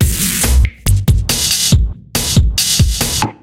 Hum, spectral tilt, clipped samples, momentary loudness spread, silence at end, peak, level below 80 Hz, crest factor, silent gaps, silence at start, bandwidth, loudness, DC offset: none; -3 dB/octave; under 0.1%; 4 LU; 0.1 s; 0 dBFS; -16 dBFS; 12 dB; none; 0 s; 17 kHz; -13 LUFS; under 0.1%